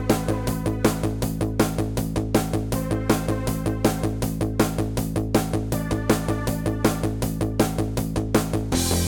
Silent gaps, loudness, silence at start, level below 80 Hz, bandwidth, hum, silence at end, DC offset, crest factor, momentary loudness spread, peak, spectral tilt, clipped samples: none; -24 LUFS; 0 s; -34 dBFS; 18 kHz; none; 0 s; under 0.1%; 20 dB; 3 LU; -4 dBFS; -5.5 dB/octave; under 0.1%